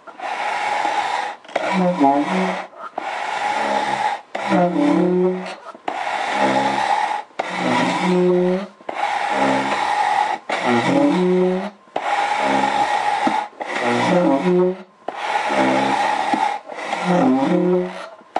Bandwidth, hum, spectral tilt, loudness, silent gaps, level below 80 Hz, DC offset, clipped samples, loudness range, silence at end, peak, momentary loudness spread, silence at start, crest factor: 11.5 kHz; none; -5.5 dB/octave; -19 LUFS; none; -64 dBFS; under 0.1%; under 0.1%; 2 LU; 0 s; -4 dBFS; 10 LU; 0.05 s; 16 dB